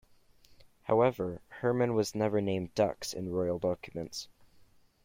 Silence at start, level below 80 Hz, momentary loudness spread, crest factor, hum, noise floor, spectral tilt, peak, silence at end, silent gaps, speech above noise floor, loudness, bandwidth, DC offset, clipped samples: 0.85 s; -62 dBFS; 12 LU; 20 dB; none; -61 dBFS; -6 dB/octave; -14 dBFS; 0.8 s; none; 30 dB; -32 LUFS; 16.5 kHz; under 0.1%; under 0.1%